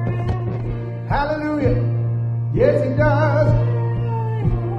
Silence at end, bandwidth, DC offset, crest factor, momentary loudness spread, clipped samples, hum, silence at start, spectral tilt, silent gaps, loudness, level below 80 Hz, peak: 0 s; 5.8 kHz; under 0.1%; 14 dB; 7 LU; under 0.1%; none; 0 s; -9.5 dB/octave; none; -20 LUFS; -32 dBFS; -4 dBFS